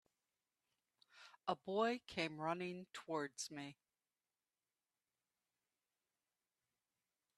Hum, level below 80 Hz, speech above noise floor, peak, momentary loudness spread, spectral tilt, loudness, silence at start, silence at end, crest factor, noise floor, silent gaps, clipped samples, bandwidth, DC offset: none; -86 dBFS; over 46 dB; -26 dBFS; 14 LU; -4 dB/octave; -44 LUFS; 1.15 s; 3.65 s; 24 dB; under -90 dBFS; none; under 0.1%; 13 kHz; under 0.1%